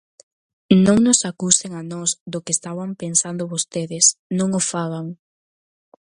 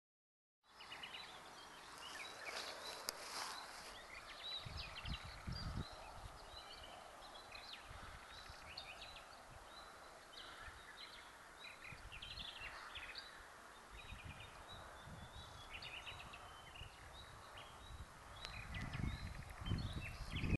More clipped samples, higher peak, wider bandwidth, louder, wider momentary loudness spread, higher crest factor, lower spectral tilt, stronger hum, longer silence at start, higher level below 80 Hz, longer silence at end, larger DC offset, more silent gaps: neither; first, 0 dBFS vs -18 dBFS; about the same, 11.5 kHz vs 12 kHz; first, -19 LUFS vs -51 LUFS; first, 13 LU vs 10 LU; second, 20 dB vs 32 dB; about the same, -4 dB/octave vs -4 dB/octave; neither; about the same, 0.7 s vs 0.65 s; about the same, -56 dBFS vs -58 dBFS; first, 0.9 s vs 0 s; neither; first, 2.20-2.26 s, 4.19-4.30 s vs none